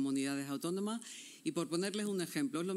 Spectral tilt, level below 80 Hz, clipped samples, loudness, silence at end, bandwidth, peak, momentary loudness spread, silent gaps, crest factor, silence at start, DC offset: -4.5 dB/octave; under -90 dBFS; under 0.1%; -38 LUFS; 0 s; 16 kHz; -22 dBFS; 6 LU; none; 14 dB; 0 s; under 0.1%